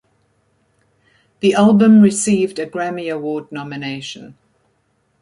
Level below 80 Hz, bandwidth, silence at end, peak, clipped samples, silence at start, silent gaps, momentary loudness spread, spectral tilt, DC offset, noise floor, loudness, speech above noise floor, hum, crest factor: -60 dBFS; 11.5 kHz; 0.9 s; -2 dBFS; under 0.1%; 1.45 s; none; 18 LU; -5.5 dB/octave; under 0.1%; -64 dBFS; -15 LUFS; 48 dB; none; 16 dB